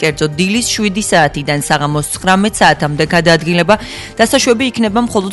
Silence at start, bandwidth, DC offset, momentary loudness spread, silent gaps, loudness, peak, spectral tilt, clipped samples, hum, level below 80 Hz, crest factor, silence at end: 0 s; 12 kHz; under 0.1%; 5 LU; none; -12 LUFS; 0 dBFS; -4 dB/octave; 0.2%; none; -38 dBFS; 12 dB; 0 s